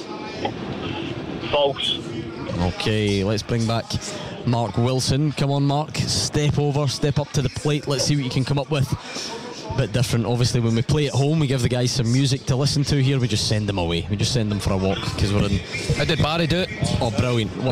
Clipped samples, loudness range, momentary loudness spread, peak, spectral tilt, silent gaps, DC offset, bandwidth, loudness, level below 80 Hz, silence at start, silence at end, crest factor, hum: under 0.1%; 3 LU; 8 LU; -10 dBFS; -5.5 dB/octave; none; under 0.1%; 15 kHz; -22 LUFS; -40 dBFS; 0 s; 0 s; 12 dB; none